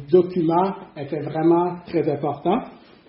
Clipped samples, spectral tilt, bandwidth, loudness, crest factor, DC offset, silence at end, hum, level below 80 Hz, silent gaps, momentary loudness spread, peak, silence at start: under 0.1%; -7.5 dB/octave; 5.6 kHz; -22 LUFS; 18 dB; under 0.1%; 0.3 s; none; -60 dBFS; none; 11 LU; -4 dBFS; 0 s